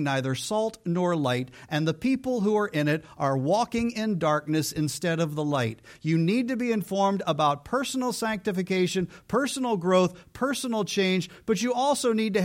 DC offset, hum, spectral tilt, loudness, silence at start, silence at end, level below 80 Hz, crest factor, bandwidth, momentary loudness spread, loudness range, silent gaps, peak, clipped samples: under 0.1%; none; -5.5 dB/octave; -26 LUFS; 0 s; 0 s; -60 dBFS; 18 dB; 16.5 kHz; 4 LU; 1 LU; none; -8 dBFS; under 0.1%